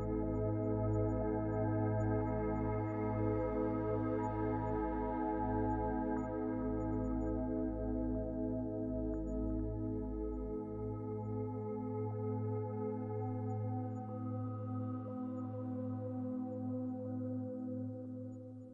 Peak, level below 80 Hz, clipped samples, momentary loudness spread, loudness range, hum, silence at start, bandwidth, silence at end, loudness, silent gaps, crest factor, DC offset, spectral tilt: -24 dBFS; -48 dBFS; under 0.1%; 6 LU; 5 LU; none; 0 s; 7 kHz; 0 s; -39 LUFS; none; 14 dB; under 0.1%; -11.5 dB/octave